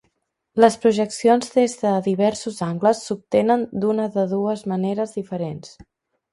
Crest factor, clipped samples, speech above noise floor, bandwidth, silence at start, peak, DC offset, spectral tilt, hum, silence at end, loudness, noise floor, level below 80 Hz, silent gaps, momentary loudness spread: 20 dB; under 0.1%; 51 dB; 11.5 kHz; 0.55 s; 0 dBFS; under 0.1%; -6 dB/octave; none; 0.65 s; -21 LUFS; -71 dBFS; -62 dBFS; none; 10 LU